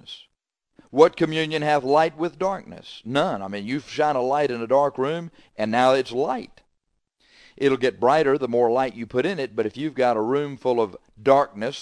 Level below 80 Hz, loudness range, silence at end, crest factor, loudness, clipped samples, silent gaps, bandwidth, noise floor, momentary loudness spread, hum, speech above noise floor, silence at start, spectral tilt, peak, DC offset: -62 dBFS; 2 LU; 0 s; 22 dB; -22 LUFS; under 0.1%; none; 10.5 kHz; -76 dBFS; 10 LU; none; 54 dB; 0.1 s; -6 dB/octave; 0 dBFS; under 0.1%